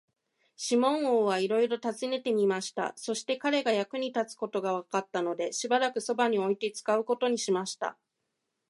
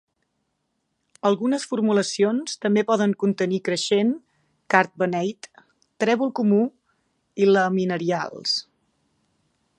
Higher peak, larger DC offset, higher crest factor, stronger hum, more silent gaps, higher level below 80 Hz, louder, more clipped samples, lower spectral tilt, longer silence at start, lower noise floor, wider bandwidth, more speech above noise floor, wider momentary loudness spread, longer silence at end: second, -12 dBFS vs -2 dBFS; neither; about the same, 18 dB vs 22 dB; neither; neither; second, -84 dBFS vs -74 dBFS; second, -29 LUFS vs -22 LUFS; neither; second, -3.5 dB/octave vs -5 dB/octave; second, 0.6 s vs 1.25 s; first, -82 dBFS vs -75 dBFS; about the same, 11.5 kHz vs 11 kHz; about the same, 53 dB vs 53 dB; about the same, 7 LU vs 6 LU; second, 0.75 s vs 1.15 s